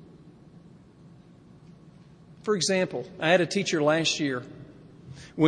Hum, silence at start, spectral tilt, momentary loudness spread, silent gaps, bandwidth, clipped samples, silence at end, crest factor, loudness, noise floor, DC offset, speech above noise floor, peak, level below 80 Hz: none; 0.25 s; -4 dB/octave; 23 LU; none; 10.5 kHz; under 0.1%; 0 s; 22 dB; -25 LUFS; -52 dBFS; under 0.1%; 27 dB; -8 dBFS; -66 dBFS